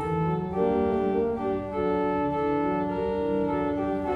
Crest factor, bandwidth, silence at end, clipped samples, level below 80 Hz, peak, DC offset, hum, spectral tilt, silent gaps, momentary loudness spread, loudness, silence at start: 12 dB; 5.8 kHz; 0 s; under 0.1%; -48 dBFS; -14 dBFS; under 0.1%; none; -9 dB/octave; none; 3 LU; -27 LUFS; 0 s